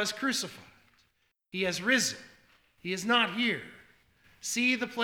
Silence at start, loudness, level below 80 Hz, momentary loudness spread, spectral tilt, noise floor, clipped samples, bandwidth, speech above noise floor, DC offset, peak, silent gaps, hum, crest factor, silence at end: 0 s; -29 LUFS; -72 dBFS; 14 LU; -2 dB/octave; -74 dBFS; under 0.1%; 18.5 kHz; 44 dB; under 0.1%; -10 dBFS; none; none; 22 dB; 0 s